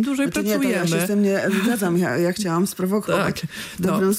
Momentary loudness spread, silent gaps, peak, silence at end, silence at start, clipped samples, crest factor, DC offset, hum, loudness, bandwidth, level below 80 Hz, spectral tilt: 4 LU; none; -10 dBFS; 0 s; 0 s; under 0.1%; 12 dB; under 0.1%; none; -21 LUFS; 16 kHz; -56 dBFS; -5.5 dB/octave